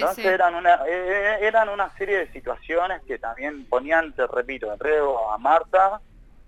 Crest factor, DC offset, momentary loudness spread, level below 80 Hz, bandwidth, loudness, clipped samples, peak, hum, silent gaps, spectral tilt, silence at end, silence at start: 16 dB; under 0.1%; 11 LU; -48 dBFS; 16 kHz; -22 LUFS; under 0.1%; -6 dBFS; none; none; -4 dB/octave; 0.45 s; 0 s